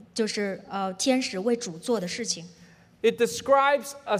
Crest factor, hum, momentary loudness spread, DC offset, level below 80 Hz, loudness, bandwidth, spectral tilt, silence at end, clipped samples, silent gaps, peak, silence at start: 18 dB; none; 10 LU; under 0.1%; -70 dBFS; -26 LUFS; 16 kHz; -3.5 dB/octave; 0 s; under 0.1%; none; -8 dBFS; 0.15 s